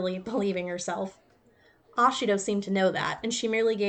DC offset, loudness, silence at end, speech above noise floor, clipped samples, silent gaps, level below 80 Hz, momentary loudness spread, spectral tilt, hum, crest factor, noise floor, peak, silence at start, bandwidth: under 0.1%; -28 LUFS; 0 s; 34 dB; under 0.1%; none; -66 dBFS; 9 LU; -4 dB/octave; none; 16 dB; -62 dBFS; -12 dBFS; 0 s; 9.2 kHz